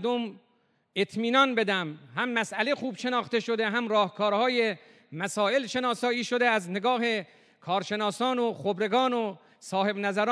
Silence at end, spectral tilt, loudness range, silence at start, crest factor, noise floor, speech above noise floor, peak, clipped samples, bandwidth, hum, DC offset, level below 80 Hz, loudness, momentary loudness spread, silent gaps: 0 s; -4 dB/octave; 2 LU; 0 s; 18 dB; -69 dBFS; 42 dB; -10 dBFS; under 0.1%; 11 kHz; none; under 0.1%; -84 dBFS; -27 LUFS; 8 LU; none